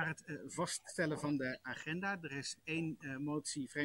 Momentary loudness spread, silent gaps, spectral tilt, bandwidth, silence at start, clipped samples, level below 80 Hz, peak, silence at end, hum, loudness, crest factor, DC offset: 5 LU; none; -4 dB/octave; 16 kHz; 0 s; under 0.1%; -74 dBFS; -22 dBFS; 0 s; none; -41 LUFS; 18 dB; under 0.1%